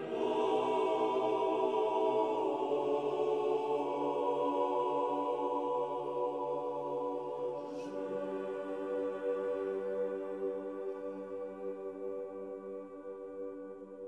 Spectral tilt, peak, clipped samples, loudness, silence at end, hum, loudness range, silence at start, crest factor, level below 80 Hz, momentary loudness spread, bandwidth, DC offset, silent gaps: -6 dB/octave; -20 dBFS; under 0.1%; -35 LUFS; 0 s; none; 8 LU; 0 s; 16 dB; -86 dBFS; 11 LU; 9.8 kHz; under 0.1%; none